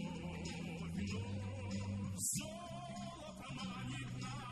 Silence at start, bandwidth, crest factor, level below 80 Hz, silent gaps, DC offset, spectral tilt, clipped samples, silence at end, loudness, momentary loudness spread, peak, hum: 0 s; 13 kHz; 18 dB; -60 dBFS; none; under 0.1%; -4.5 dB/octave; under 0.1%; 0 s; -44 LUFS; 9 LU; -26 dBFS; none